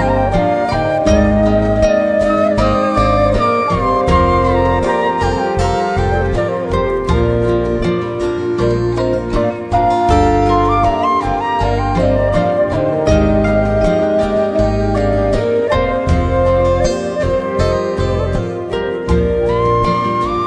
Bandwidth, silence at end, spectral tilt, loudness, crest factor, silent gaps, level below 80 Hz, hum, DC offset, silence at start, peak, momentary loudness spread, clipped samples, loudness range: 10.5 kHz; 0 s; -7 dB/octave; -14 LUFS; 14 dB; none; -24 dBFS; none; under 0.1%; 0 s; 0 dBFS; 5 LU; under 0.1%; 3 LU